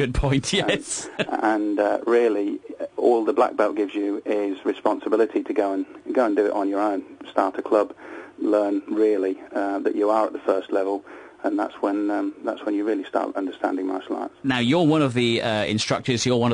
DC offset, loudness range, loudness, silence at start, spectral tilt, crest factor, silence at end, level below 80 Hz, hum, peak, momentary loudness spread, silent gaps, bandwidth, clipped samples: under 0.1%; 3 LU; -23 LUFS; 0 s; -5 dB/octave; 18 dB; 0 s; -46 dBFS; none; -4 dBFS; 9 LU; none; 10.5 kHz; under 0.1%